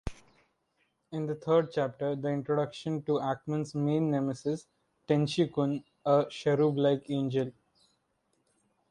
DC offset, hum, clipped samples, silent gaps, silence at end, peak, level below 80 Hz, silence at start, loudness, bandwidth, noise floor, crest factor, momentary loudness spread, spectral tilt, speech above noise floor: under 0.1%; none; under 0.1%; none; 1.4 s; -12 dBFS; -58 dBFS; 0.05 s; -30 LUFS; 11 kHz; -76 dBFS; 20 dB; 8 LU; -7.5 dB/octave; 47 dB